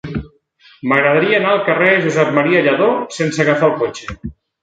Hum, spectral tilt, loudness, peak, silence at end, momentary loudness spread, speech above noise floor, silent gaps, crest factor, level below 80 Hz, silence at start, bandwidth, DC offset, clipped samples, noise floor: none; -5.5 dB/octave; -14 LUFS; 0 dBFS; 0.3 s; 15 LU; 35 dB; none; 16 dB; -44 dBFS; 0.05 s; 9.2 kHz; under 0.1%; under 0.1%; -49 dBFS